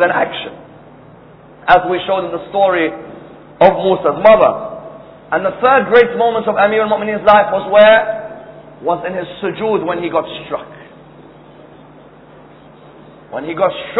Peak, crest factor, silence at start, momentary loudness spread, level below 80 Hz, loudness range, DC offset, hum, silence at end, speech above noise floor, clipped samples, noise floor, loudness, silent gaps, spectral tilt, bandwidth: 0 dBFS; 14 dB; 0 s; 18 LU; -48 dBFS; 13 LU; under 0.1%; none; 0 s; 27 dB; 0.2%; -40 dBFS; -13 LUFS; none; -8 dB/octave; 5.4 kHz